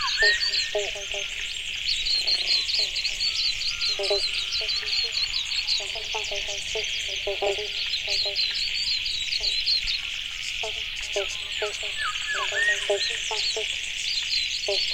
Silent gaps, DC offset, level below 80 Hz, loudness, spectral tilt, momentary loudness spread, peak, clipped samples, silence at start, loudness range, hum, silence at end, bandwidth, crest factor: none; under 0.1%; -48 dBFS; -24 LUFS; 0.5 dB/octave; 7 LU; -8 dBFS; under 0.1%; 0 s; 3 LU; none; 0 s; 16.5 kHz; 18 dB